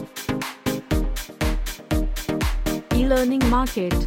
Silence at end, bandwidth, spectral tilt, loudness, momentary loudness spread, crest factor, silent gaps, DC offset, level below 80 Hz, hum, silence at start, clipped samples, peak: 0 s; 17 kHz; -5.5 dB/octave; -24 LUFS; 8 LU; 14 dB; none; under 0.1%; -26 dBFS; none; 0 s; under 0.1%; -8 dBFS